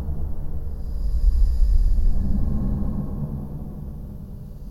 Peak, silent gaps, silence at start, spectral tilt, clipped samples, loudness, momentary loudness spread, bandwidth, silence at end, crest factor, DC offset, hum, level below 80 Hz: -6 dBFS; none; 0 s; -9.5 dB/octave; under 0.1%; -27 LUFS; 14 LU; 5.2 kHz; 0 s; 14 dB; under 0.1%; none; -22 dBFS